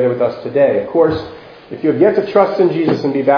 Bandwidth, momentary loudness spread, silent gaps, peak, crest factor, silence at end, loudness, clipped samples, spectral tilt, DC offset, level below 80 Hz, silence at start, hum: 5.4 kHz; 8 LU; none; 0 dBFS; 14 dB; 0 s; -14 LUFS; under 0.1%; -8.5 dB/octave; under 0.1%; -50 dBFS; 0 s; none